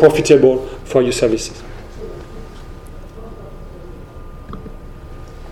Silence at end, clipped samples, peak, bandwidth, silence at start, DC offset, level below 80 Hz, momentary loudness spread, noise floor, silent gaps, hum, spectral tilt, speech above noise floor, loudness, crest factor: 0 s; under 0.1%; 0 dBFS; 14.5 kHz; 0 s; under 0.1%; -34 dBFS; 26 LU; -33 dBFS; none; none; -5.5 dB/octave; 21 dB; -14 LUFS; 18 dB